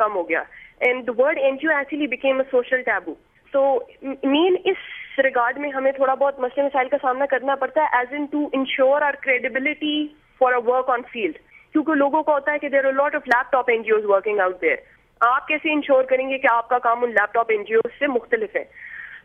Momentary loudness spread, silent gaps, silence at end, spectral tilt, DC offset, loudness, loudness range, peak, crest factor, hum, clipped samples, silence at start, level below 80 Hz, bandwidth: 7 LU; none; 0.05 s; -5.5 dB/octave; under 0.1%; -21 LUFS; 2 LU; -4 dBFS; 16 dB; none; under 0.1%; 0 s; -64 dBFS; 5.8 kHz